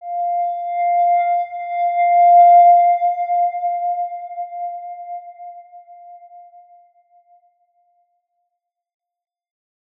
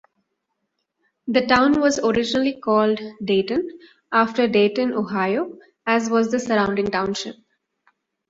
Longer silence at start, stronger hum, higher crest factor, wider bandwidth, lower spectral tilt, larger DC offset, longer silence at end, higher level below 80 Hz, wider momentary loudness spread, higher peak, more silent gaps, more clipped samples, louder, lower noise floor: second, 0 s vs 1.25 s; neither; second, 14 dB vs 20 dB; second, 3.7 kHz vs 8 kHz; second, -2.5 dB/octave vs -4.5 dB/octave; neither; first, 3.6 s vs 0.95 s; second, -84 dBFS vs -56 dBFS; first, 22 LU vs 9 LU; about the same, -4 dBFS vs -2 dBFS; neither; neither; first, -15 LUFS vs -20 LUFS; about the same, -78 dBFS vs -76 dBFS